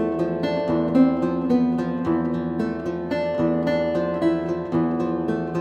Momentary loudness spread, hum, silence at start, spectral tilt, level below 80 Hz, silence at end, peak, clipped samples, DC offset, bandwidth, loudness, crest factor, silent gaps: 6 LU; none; 0 s; -8.5 dB/octave; -50 dBFS; 0 s; -6 dBFS; under 0.1%; under 0.1%; 7.2 kHz; -23 LUFS; 16 dB; none